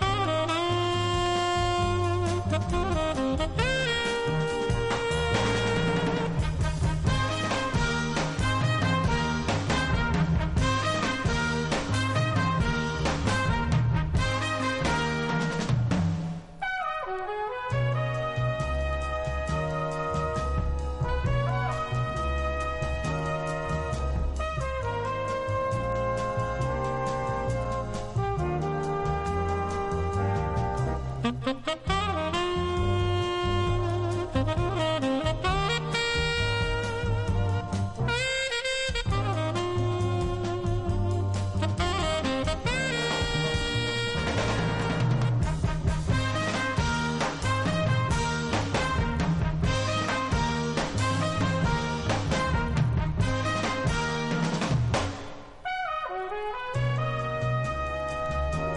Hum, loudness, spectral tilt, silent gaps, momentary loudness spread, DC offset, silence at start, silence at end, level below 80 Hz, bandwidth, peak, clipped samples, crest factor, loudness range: none; -28 LUFS; -5.5 dB/octave; none; 5 LU; under 0.1%; 0 s; 0 s; -36 dBFS; 11.5 kHz; -12 dBFS; under 0.1%; 16 dB; 3 LU